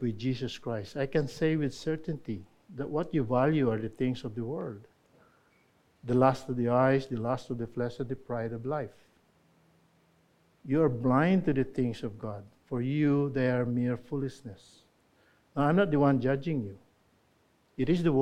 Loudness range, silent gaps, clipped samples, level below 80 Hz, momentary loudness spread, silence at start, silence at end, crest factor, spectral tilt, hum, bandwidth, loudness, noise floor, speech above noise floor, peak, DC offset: 4 LU; none; under 0.1%; -58 dBFS; 15 LU; 0 s; 0 s; 20 dB; -8 dB/octave; none; 10.5 kHz; -30 LUFS; -68 dBFS; 39 dB; -10 dBFS; under 0.1%